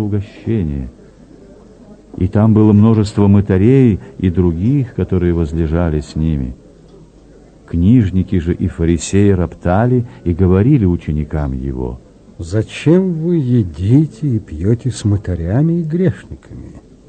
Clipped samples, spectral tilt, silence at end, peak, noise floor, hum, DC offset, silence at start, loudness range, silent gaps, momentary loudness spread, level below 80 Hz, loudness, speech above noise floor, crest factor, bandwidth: under 0.1%; -8.5 dB/octave; 0.3 s; 0 dBFS; -42 dBFS; none; under 0.1%; 0 s; 5 LU; none; 11 LU; -30 dBFS; -15 LUFS; 29 dB; 14 dB; 9 kHz